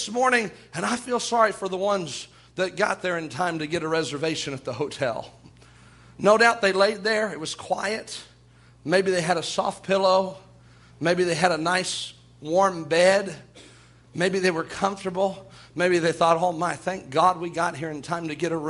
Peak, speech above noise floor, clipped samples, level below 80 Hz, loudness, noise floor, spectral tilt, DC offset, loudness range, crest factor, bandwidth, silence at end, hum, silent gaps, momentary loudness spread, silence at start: -2 dBFS; 30 dB; under 0.1%; -62 dBFS; -24 LUFS; -54 dBFS; -4 dB/octave; under 0.1%; 3 LU; 22 dB; 11.5 kHz; 0 s; none; none; 12 LU; 0 s